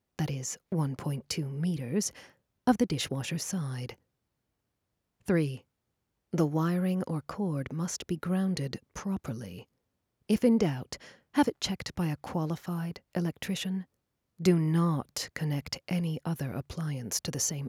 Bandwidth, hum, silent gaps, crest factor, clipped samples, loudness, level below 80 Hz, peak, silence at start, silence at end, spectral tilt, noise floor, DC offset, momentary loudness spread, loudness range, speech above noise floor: 16 kHz; none; none; 18 dB; under 0.1%; -31 LUFS; -60 dBFS; -12 dBFS; 0.2 s; 0 s; -5.5 dB/octave; -82 dBFS; under 0.1%; 10 LU; 3 LU; 51 dB